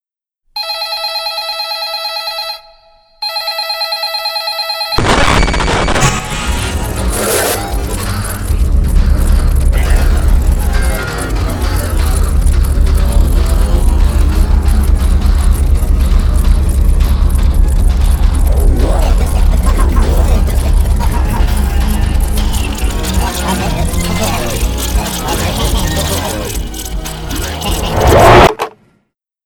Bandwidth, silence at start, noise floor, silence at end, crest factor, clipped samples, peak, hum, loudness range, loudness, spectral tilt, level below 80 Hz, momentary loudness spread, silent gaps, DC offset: 18.5 kHz; 0.55 s; -63 dBFS; 0.75 s; 10 dB; 0.2%; 0 dBFS; none; 3 LU; -14 LUFS; -4.5 dB/octave; -12 dBFS; 6 LU; none; under 0.1%